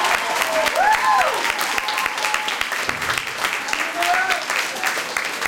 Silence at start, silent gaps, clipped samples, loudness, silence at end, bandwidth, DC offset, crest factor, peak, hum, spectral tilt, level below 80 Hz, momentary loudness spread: 0 s; none; under 0.1%; -20 LUFS; 0 s; 17 kHz; under 0.1%; 18 dB; -2 dBFS; none; -0.5 dB/octave; -54 dBFS; 5 LU